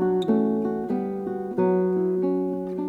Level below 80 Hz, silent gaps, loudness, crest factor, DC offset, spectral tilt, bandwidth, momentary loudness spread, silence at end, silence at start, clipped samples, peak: -60 dBFS; none; -24 LUFS; 12 dB; under 0.1%; -9.5 dB/octave; 4.3 kHz; 6 LU; 0 s; 0 s; under 0.1%; -12 dBFS